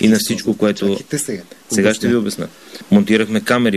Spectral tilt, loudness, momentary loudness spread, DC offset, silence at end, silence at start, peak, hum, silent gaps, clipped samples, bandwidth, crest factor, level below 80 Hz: -4.5 dB/octave; -17 LUFS; 13 LU; 0.2%; 0 s; 0 s; -2 dBFS; none; none; under 0.1%; 14 kHz; 16 dB; -54 dBFS